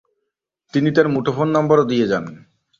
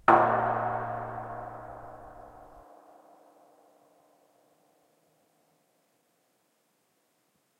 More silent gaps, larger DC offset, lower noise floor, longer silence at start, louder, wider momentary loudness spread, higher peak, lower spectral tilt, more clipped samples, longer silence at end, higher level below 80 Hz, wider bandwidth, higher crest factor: neither; neither; first, -78 dBFS vs -73 dBFS; first, 0.75 s vs 0.05 s; first, -18 LUFS vs -29 LUFS; second, 9 LU vs 29 LU; first, -2 dBFS vs -6 dBFS; about the same, -7.5 dB/octave vs -7.5 dB/octave; neither; second, 0.4 s vs 5 s; first, -58 dBFS vs -64 dBFS; second, 7.2 kHz vs 12.5 kHz; second, 18 dB vs 28 dB